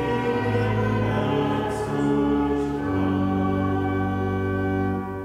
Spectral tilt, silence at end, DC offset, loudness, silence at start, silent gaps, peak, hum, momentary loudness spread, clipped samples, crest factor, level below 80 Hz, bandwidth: -8 dB/octave; 0 s; under 0.1%; -24 LUFS; 0 s; none; -10 dBFS; none; 3 LU; under 0.1%; 12 dB; -42 dBFS; 12 kHz